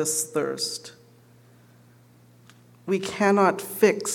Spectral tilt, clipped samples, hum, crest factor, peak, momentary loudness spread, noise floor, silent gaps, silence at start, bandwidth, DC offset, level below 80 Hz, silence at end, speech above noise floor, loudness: -3.5 dB/octave; under 0.1%; 60 Hz at -55 dBFS; 20 dB; -6 dBFS; 16 LU; -54 dBFS; none; 0 s; 18 kHz; under 0.1%; -74 dBFS; 0 s; 31 dB; -24 LUFS